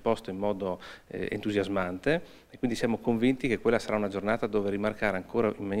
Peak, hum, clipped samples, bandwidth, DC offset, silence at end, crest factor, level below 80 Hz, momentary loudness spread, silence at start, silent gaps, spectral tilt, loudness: -10 dBFS; none; under 0.1%; 15.5 kHz; under 0.1%; 0 s; 18 dB; -52 dBFS; 8 LU; 0 s; none; -6.5 dB/octave; -30 LUFS